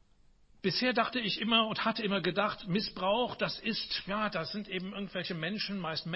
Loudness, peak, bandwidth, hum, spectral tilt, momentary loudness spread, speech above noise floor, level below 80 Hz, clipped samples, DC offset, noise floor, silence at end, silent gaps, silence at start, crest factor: -32 LUFS; -12 dBFS; 6 kHz; none; -7.5 dB/octave; 9 LU; 30 dB; -64 dBFS; under 0.1%; under 0.1%; -63 dBFS; 0 s; none; 0.65 s; 20 dB